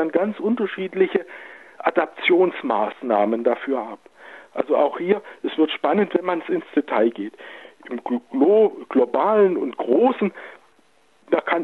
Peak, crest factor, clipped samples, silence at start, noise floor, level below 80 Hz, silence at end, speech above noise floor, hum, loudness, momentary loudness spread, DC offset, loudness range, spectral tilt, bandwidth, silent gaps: -4 dBFS; 18 dB; under 0.1%; 0 s; -60 dBFS; -80 dBFS; 0 s; 39 dB; none; -21 LUFS; 17 LU; under 0.1%; 3 LU; -7.5 dB/octave; 4.3 kHz; none